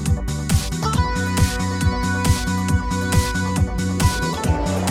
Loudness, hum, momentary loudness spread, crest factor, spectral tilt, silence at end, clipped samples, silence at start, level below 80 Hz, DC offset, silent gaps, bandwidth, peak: -21 LUFS; none; 2 LU; 14 dB; -5 dB/octave; 0 s; under 0.1%; 0 s; -28 dBFS; under 0.1%; none; 16.5 kHz; -4 dBFS